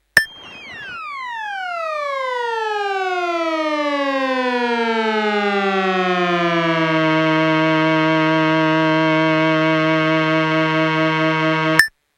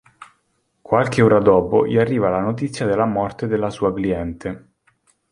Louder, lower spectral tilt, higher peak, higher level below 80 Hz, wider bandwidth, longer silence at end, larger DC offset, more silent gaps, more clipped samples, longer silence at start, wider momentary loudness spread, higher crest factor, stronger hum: about the same, -17 LUFS vs -18 LUFS; second, -5.5 dB/octave vs -7.5 dB/octave; about the same, 0 dBFS vs -2 dBFS; second, -58 dBFS vs -46 dBFS; first, 16 kHz vs 11 kHz; second, 0.3 s vs 0.75 s; neither; neither; neither; about the same, 0.15 s vs 0.2 s; about the same, 9 LU vs 11 LU; about the same, 18 dB vs 18 dB; neither